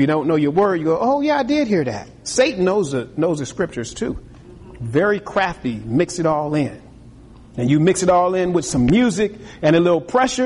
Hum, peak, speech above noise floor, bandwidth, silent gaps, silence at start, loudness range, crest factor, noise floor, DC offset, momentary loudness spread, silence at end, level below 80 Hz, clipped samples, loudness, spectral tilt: none; -4 dBFS; 24 dB; 11.5 kHz; none; 0 s; 4 LU; 14 dB; -42 dBFS; under 0.1%; 10 LU; 0 s; -44 dBFS; under 0.1%; -19 LUFS; -5.5 dB/octave